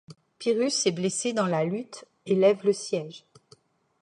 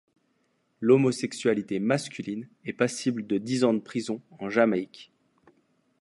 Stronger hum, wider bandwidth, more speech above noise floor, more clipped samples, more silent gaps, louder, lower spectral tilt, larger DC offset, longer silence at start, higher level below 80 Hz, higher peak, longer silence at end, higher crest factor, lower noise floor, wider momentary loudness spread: neither; about the same, 11.5 kHz vs 11.5 kHz; second, 34 dB vs 45 dB; neither; neither; about the same, -26 LUFS vs -27 LUFS; about the same, -4.5 dB/octave vs -5.5 dB/octave; neither; second, 0.1 s vs 0.8 s; about the same, -76 dBFS vs -72 dBFS; about the same, -8 dBFS vs -8 dBFS; about the same, 0.85 s vs 0.95 s; about the same, 18 dB vs 20 dB; second, -60 dBFS vs -71 dBFS; about the same, 14 LU vs 13 LU